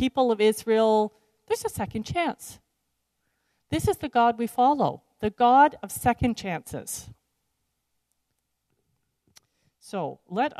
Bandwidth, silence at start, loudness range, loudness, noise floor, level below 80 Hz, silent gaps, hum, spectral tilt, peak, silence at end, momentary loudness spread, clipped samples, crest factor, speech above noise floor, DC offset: 14 kHz; 0 s; 18 LU; -25 LUFS; -78 dBFS; -52 dBFS; none; none; -5 dB/octave; -8 dBFS; 0 s; 14 LU; under 0.1%; 20 dB; 54 dB; under 0.1%